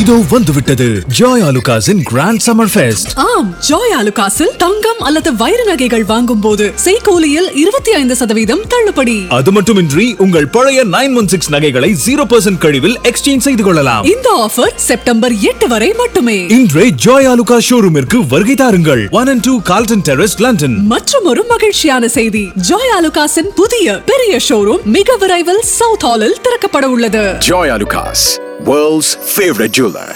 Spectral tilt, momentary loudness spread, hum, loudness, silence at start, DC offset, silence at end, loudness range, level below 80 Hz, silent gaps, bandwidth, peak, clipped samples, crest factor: -4 dB/octave; 3 LU; none; -9 LUFS; 0 s; under 0.1%; 0 s; 2 LU; -34 dBFS; none; 18.5 kHz; 0 dBFS; 0.8%; 10 dB